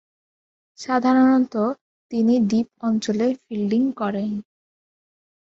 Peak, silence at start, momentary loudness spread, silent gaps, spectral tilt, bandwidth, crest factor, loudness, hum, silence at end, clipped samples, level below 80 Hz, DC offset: -6 dBFS; 0.8 s; 12 LU; 1.81-2.09 s; -6.5 dB/octave; 7.8 kHz; 16 dB; -21 LUFS; none; 1 s; under 0.1%; -64 dBFS; under 0.1%